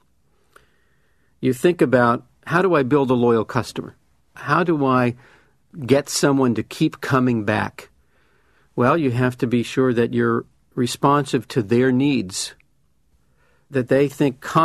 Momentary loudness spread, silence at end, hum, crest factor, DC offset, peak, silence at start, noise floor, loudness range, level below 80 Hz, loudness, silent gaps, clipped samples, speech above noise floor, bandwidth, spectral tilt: 10 LU; 0 s; none; 18 dB; under 0.1%; -2 dBFS; 1.4 s; -65 dBFS; 2 LU; -56 dBFS; -20 LUFS; none; under 0.1%; 46 dB; 13.5 kHz; -6 dB/octave